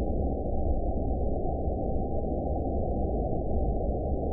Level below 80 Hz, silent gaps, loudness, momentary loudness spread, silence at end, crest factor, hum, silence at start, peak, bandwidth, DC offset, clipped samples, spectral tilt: -32 dBFS; none; -31 LUFS; 1 LU; 0 s; 12 dB; none; 0 s; -16 dBFS; 0.9 kHz; under 0.1%; under 0.1%; -17 dB/octave